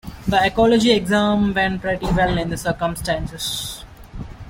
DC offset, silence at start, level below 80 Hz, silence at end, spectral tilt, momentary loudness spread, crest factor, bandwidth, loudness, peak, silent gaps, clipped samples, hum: under 0.1%; 0.05 s; -36 dBFS; 0 s; -5 dB/octave; 15 LU; 16 dB; 16.5 kHz; -19 LUFS; -4 dBFS; none; under 0.1%; none